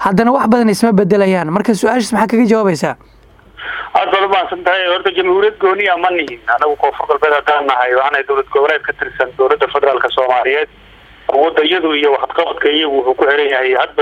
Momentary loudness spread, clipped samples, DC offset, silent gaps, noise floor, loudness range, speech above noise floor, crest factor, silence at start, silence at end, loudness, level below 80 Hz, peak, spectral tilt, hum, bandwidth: 6 LU; under 0.1%; under 0.1%; none; -40 dBFS; 1 LU; 27 dB; 14 dB; 0 s; 0 s; -13 LUFS; -48 dBFS; 0 dBFS; -5 dB/octave; none; 15.5 kHz